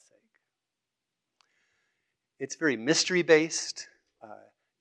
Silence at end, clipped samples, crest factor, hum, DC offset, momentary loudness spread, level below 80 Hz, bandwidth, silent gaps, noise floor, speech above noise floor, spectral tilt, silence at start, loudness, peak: 0.45 s; under 0.1%; 24 dB; none; under 0.1%; 19 LU; -86 dBFS; 9.6 kHz; none; -87 dBFS; 61 dB; -3 dB/octave; 2.4 s; -26 LUFS; -8 dBFS